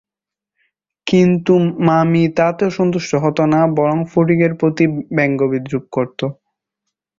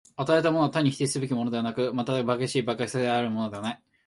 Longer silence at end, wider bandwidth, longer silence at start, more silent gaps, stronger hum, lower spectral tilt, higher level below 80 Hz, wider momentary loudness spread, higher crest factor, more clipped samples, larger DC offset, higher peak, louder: first, 0.85 s vs 0.3 s; second, 7.4 kHz vs 11.5 kHz; first, 1.05 s vs 0.2 s; neither; neither; first, -7.5 dB/octave vs -5.5 dB/octave; first, -54 dBFS vs -66 dBFS; about the same, 8 LU vs 6 LU; about the same, 14 dB vs 16 dB; neither; neither; first, -2 dBFS vs -10 dBFS; first, -16 LUFS vs -27 LUFS